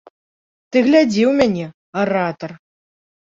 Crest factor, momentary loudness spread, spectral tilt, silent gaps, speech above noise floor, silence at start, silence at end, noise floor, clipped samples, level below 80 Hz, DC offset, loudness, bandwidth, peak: 16 dB; 14 LU; -6 dB/octave; 1.74-1.93 s; over 74 dB; 0.7 s; 0.65 s; under -90 dBFS; under 0.1%; -56 dBFS; under 0.1%; -17 LUFS; 7.8 kHz; -2 dBFS